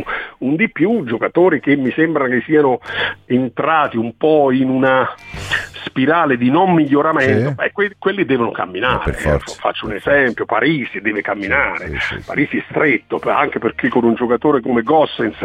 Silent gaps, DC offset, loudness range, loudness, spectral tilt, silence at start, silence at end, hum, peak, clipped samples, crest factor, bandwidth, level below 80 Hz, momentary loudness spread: none; under 0.1%; 2 LU; -16 LUFS; -6.5 dB/octave; 0 s; 0 s; none; -2 dBFS; under 0.1%; 14 dB; 11.5 kHz; -38 dBFS; 7 LU